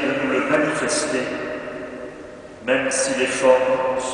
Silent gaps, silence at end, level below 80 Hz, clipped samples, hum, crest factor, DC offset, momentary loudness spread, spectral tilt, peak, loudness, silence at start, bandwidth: none; 0 s; -56 dBFS; under 0.1%; none; 18 dB; under 0.1%; 17 LU; -3 dB/octave; -2 dBFS; -20 LUFS; 0 s; 10.5 kHz